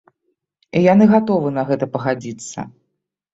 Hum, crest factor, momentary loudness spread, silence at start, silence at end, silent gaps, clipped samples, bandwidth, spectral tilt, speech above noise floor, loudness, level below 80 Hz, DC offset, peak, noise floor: none; 16 dB; 18 LU; 0.75 s; 0.65 s; none; under 0.1%; 8 kHz; -7 dB/octave; 59 dB; -16 LUFS; -58 dBFS; under 0.1%; -2 dBFS; -75 dBFS